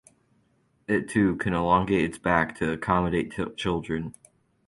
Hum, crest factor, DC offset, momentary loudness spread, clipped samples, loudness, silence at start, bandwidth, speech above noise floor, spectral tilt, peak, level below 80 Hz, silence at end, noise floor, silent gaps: none; 22 dB; under 0.1%; 10 LU; under 0.1%; -26 LUFS; 0.9 s; 11.5 kHz; 42 dB; -6.5 dB/octave; -6 dBFS; -48 dBFS; 0.55 s; -67 dBFS; none